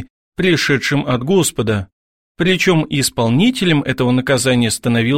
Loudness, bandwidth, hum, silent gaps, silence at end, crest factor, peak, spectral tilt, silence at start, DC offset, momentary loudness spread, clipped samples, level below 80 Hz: -15 LUFS; 16.5 kHz; none; 0.10-0.32 s, 1.92-2.35 s; 0 s; 14 dB; -2 dBFS; -4.5 dB/octave; 0 s; 0.4%; 6 LU; under 0.1%; -44 dBFS